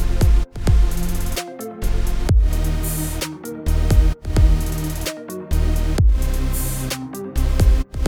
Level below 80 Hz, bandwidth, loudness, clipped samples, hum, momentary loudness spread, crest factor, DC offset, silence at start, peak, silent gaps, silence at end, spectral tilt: -18 dBFS; 18.5 kHz; -21 LUFS; under 0.1%; none; 9 LU; 14 dB; under 0.1%; 0 s; -2 dBFS; none; 0 s; -5.5 dB/octave